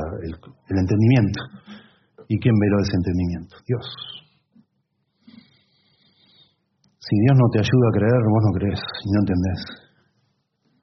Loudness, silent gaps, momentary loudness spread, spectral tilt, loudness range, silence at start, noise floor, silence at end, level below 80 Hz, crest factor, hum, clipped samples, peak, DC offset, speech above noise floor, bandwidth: -20 LUFS; none; 18 LU; -7.5 dB/octave; 13 LU; 0 s; -72 dBFS; 1.05 s; -52 dBFS; 18 dB; none; under 0.1%; -4 dBFS; under 0.1%; 52 dB; 6.2 kHz